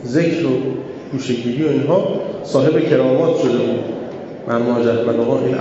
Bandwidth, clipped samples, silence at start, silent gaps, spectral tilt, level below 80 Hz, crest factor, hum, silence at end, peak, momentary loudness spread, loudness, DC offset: 8.2 kHz; under 0.1%; 0 s; none; -7 dB/octave; -60 dBFS; 16 dB; none; 0 s; -2 dBFS; 11 LU; -17 LUFS; under 0.1%